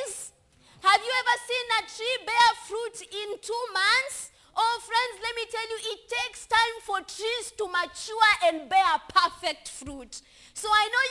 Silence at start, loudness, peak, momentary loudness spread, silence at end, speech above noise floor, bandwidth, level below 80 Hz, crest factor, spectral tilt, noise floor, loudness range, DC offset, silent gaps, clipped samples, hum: 0 s; -26 LUFS; -6 dBFS; 15 LU; 0 s; 31 dB; 12 kHz; -62 dBFS; 20 dB; 0 dB/octave; -58 dBFS; 3 LU; under 0.1%; none; under 0.1%; none